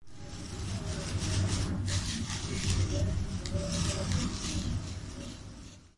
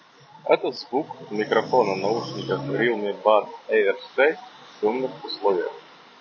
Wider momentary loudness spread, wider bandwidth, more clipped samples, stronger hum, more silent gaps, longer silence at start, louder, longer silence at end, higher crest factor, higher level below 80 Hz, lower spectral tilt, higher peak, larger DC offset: first, 13 LU vs 10 LU; first, 11.5 kHz vs 7 kHz; neither; neither; neither; second, 0 s vs 0.45 s; second, -34 LUFS vs -24 LUFS; second, 0.1 s vs 0.4 s; second, 14 dB vs 22 dB; first, -42 dBFS vs -70 dBFS; second, -4.5 dB/octave vs -6 dB/octave; second, -18 dBFS vs -2 dBFS; neither